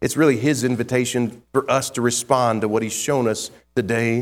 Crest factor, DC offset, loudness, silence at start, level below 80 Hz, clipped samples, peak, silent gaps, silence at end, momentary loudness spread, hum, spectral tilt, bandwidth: 18 dB; under 0.1%; -21 LUFS; 0 s; -54 dBFS; under 0.1%; -2 dBFS; none; 0 s; 6 LU; none; -4.5 dB/octave; 17 kHz